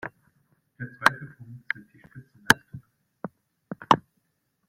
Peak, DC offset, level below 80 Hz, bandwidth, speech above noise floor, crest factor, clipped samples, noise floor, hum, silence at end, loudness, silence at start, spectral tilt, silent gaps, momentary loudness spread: 0 dBFS; under 0.1%; -62 dBFS; 16.5 kHz; 44 dB; 28 dB; under 0.1%; -75 dBFS; none; 0.7 s; -24 LUFS; 0.05 s; -3 dB/octave; none; 22 LU